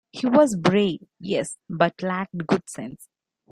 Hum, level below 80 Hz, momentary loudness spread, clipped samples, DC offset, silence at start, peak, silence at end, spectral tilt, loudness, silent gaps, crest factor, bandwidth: none; -62 dBFS; 16 LU; under 0.1%; under 0.1%; 0.15 s; -2 dBFS; 0.45 s; -5.5 dB/octave; -23 LUFS; none; 20 dB; 13.5 kHz